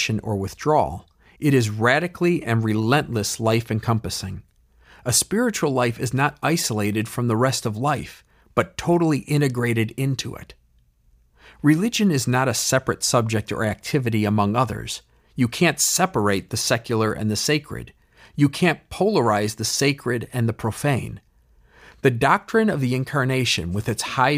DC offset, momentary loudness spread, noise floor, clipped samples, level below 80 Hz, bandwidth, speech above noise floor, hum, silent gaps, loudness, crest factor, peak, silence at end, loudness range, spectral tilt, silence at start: under 0.1%; 8 LU; -59 dBFS; under 0.1%; -50 dBFS; 16 kHz; 38 dB; none; none; -21 LUFS; 18 dB; -4 dBFS; 0 s; 2 LU; -4.5 dB/octave; 0 s